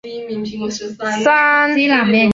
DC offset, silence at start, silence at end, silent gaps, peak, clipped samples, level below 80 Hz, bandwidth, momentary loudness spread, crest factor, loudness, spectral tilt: under 0.1%; 0.05 s; 0 s; none; -2 dBFS; under 0.1%; -52 dBFS; 8 kHz; 13 LU; 14 dB; -15 LUFS; -4.5 dB/octave